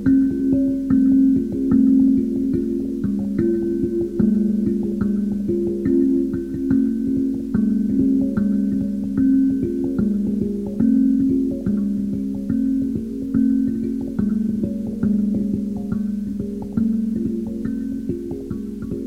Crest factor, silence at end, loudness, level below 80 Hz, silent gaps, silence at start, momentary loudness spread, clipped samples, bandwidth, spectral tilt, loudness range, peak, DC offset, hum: 14 dB; 0 s; -20 LUFS; -42 dBFS; none; 0 s; 8 LU; under 0.1%; 2.3 kHz; -10 dB/octave; 5 LU; -6 dBFS; under 0.1%; none